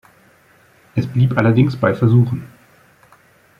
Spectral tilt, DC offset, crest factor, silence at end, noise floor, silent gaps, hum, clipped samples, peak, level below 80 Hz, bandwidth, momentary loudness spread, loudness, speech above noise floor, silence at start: -9.5 dB/octave; under 0.1%; 18 dB; 1.1 s; -52 dBFS; none; none; under 0.1%; 0 dBFS; -50 dBFS; 5.4 kHz; 10 LU; -16 LUFS; 37 dB; 0.95 s